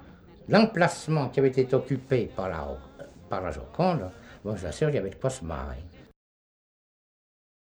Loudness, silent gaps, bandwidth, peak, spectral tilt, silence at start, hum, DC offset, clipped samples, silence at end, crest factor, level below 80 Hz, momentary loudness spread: -27 LUFS; none; over 20 kHz; -6 dBFS; -6.5 dB/octave; 0 s; none; under 0.1%; under 0.1%; 1.7 s; 24 dB; -48 dBFS; 17 LU